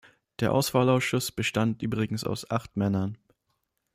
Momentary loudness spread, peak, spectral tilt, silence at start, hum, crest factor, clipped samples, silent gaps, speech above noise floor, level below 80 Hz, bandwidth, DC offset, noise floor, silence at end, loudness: 8 LU; -10 dBFS; -5.5 dB/octave; 0.4 s; none; 18 dB; under 0.1%; none; 51 dB; -58 dBFS; 16 kHz; under 0.1%; -77 dBFS; 0.8 s; -27 LUFS